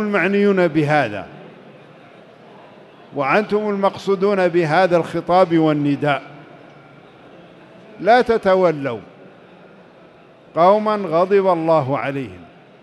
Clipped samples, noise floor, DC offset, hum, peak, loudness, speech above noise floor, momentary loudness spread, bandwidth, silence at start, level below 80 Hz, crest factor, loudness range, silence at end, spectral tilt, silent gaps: under 0.1%; -46 dBFS; under 0.1%; none; -2 dBFS; -17 LUFS; 30 dB; 11 LU; 11.5 kHz; 0 s; -58 dBFS; 16 dB; 4 LU; 0.4 s; -7.5 dB/octave; none